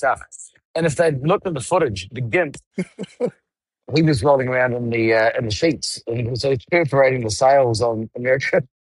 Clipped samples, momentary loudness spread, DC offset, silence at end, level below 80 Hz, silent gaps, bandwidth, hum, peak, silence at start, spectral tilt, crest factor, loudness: under 0.1%; 11 LU; under 0.1%; 0.15 s; -50 dBFS; 0.65-0.74 s, 2.66-2.71 s; 12 kHz; none; -4 dBFS; 0 s; -5.5 dB/octave; 16 dB; -19 LUFS